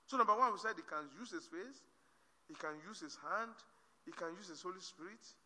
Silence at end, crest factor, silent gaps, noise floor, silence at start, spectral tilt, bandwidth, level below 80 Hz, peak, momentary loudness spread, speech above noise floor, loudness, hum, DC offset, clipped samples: 0.1 s; 22 dB; none; -74 dBFS; 0.1 s; -3 dB/octave; 11 kHz; under -90 dBFS; -20 dBFS; 20 LU; 32 dB; -42 LUFS; none; under 0.1%; under 0.1%